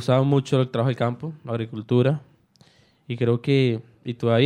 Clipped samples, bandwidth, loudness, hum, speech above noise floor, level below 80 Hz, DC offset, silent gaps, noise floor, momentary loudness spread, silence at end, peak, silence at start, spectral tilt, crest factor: under 0.1%; 9.8 kHz; -23 LUFS; none; 35 dB; -66 dBFS; under 0.1%; none; -57 dBFS; 11 LU; 0 s; -6 dBFS; 0 s; -8 dB/octave; 16 dB